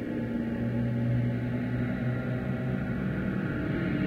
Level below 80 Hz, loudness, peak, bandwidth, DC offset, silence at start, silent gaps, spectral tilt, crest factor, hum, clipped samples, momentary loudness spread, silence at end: -46 dBFS; -31 LUFS; -18 dBFS; 5 kHz; under 0.1%; 0 s; none; -9.5 dB/octave; 12 dB; none; under 0.1%; 3 LU; 0 s